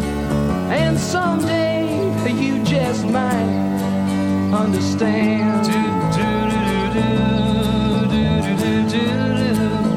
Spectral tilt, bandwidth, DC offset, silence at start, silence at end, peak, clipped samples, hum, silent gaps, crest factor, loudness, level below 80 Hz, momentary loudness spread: -6.5 dB/octave; 15.5 kHz; under 0.1%; 0 s; 0 s; -4 dBFS; under 0.1%; none; none; 12 dB; -18 LUFS; -36 dBFS; 2 LU